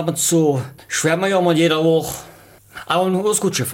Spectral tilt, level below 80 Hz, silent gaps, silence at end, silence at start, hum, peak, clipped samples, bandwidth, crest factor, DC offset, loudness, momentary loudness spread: -4 dB/octave; -56 dBFS; none; 0 s; 0 s; none; -4 dBFS; under 0.1%; 17 kHz; 14 dB; under 0.1%; -17 LUFS; 10 LU